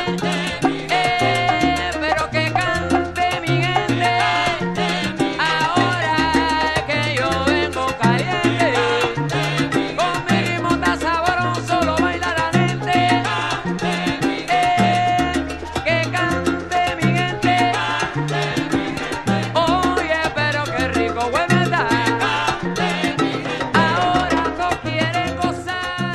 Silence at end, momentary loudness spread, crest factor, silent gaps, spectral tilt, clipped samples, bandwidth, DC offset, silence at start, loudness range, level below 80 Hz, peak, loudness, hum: 0 s; 5 LU; 18 dB; none; -5 dB/octave; under 0.1%; 14 kHz; under 0.1%; 0 s; 1 LU; -40 dBFS; -2 dBFS; -19 LUFS; none